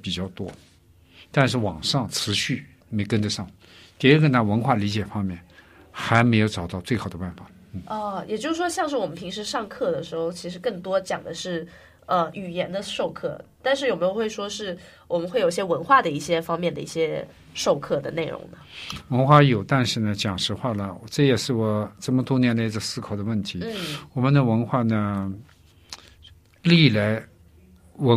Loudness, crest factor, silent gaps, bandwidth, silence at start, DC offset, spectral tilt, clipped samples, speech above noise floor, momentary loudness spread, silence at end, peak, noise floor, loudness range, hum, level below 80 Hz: -24 LUFS; 22 dB; none; 15 kHz; 0.05 s; under 0.1%; -5.5 dB/octave; under 0.1%; 30 dB; 15 LU; 0 s; -2 dBFS; -53 dBFS; 6 LU; none; -56 dBFS